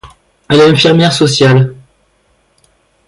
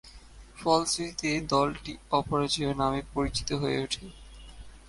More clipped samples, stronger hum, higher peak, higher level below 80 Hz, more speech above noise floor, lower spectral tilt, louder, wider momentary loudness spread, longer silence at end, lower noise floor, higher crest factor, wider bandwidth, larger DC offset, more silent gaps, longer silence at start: neither; neither; first, 0 dBFS vs -10 dBFS; about the same, -46 dBFS vs -48 dBFS; first, 48 dB vs 21 dB; first, -5.5 dB/octave vs -4 dB/octave; first, -8 LUFS vs -29 LUFS; second, 6 LU vs 9 LU; first, 1.35 s vs 0 s; first, -55 dBFS vs -49 dBFS; second, 12 dB vs 20 dB; about the same, 11.5 kHz vs 11.5 kHz; neither; neither; about the same, 0.05 s vs 0.05 s